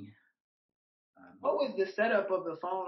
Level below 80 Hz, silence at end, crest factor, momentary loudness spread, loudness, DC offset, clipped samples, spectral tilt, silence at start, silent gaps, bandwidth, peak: under -90 dBFS; 0 s; 18 dB; 7 LU; -32 LUFS; under 0.1%; under 0.1%; -3 dB/octave; 0 s; 0.40-1.13 s; 6 kHz; -16 dBFS